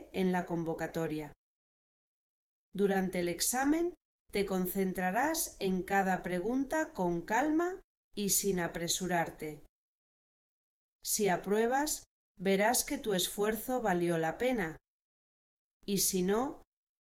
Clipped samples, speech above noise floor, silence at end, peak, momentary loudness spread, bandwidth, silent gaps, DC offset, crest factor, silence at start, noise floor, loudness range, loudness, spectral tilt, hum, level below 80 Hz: under 0.1%; over 58 dB; 0.4 s; -16 dBFS; 9 LU; 17.5 kHz; 1.36-2.72 s, 4.05-4.25 s, 7.84-8.11 s, 9.69-10.99 s, 12.06-12.35 s, 14.88-15.80 s; under 0.1%; 18 dB; 0 s; under -90 dBFS; 4 LU; -33 LUFS; -4 dB/octave; none; -60 dBFS